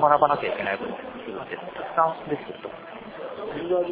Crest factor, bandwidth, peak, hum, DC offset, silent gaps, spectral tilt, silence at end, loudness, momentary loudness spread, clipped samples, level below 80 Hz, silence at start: 22 dB; 4 kHz; -4 dBFS; none; under 0.1%; none; -9 dB/octave; 0 s; -27 LUFS; 16 LU; under 0.1%; -62 dBFS; 0 s